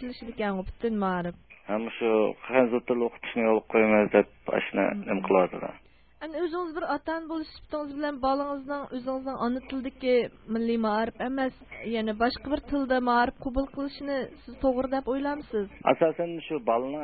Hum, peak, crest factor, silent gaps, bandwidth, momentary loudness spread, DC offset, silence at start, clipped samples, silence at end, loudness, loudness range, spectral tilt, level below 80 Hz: none; -6 dBFS; 22 dB; none; 4.8 kHz; 10 LU; under 0.1%; 0 s; under 0.1%; 0 s; -28 LUFS; 6 LU; -10 dB/octave; -52 dBFS